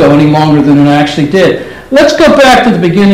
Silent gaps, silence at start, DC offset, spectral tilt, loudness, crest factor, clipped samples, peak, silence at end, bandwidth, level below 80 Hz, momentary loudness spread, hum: none; 0 s; under 0.1%; -6 dB/octave; -6 LUFS; 6 dB; 3%; 0 dBFS; 0 s; 15 kHz; -34 dBFS; 5 LU; none